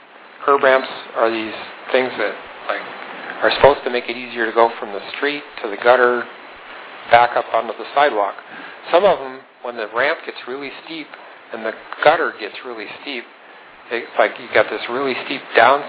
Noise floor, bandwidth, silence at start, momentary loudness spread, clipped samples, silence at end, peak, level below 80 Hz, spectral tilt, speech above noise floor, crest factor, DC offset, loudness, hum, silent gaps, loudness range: -42 dBFS; 4 kHz; 0.2 s; 17 LU; under 0.1%; 0 s; 0 dBFS; -56 dBFS; -7.5 dB/octave; 24 dB; 20 dB; under 0.1%; -18 LUFS; none; none; 5 LU